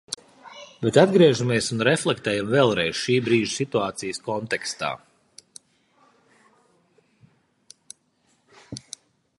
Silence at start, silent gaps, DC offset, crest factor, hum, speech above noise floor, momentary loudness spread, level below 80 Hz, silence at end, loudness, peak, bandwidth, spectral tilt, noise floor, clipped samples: 0.1 s; none; under 0.1%; 24 dB; none; 45 dB; 23 LU; -62 dBFS; 0.6 s; -22 LUFS; 0 dBFS; 11.5 kHz; -5 dB/octave; -66 dBFS; under 0.1%